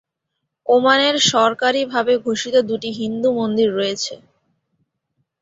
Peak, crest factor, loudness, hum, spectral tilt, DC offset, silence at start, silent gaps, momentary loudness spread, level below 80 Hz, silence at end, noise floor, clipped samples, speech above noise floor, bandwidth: -2 dBFS; 18 dB; -17 LUFS; none; -3 dB/octave; under 0.1%; 0.65 s; none; 10 LU; -64 dBFS; 1.25 s; -77 dBFS; under 0.1%; 60 dB; 8 kHz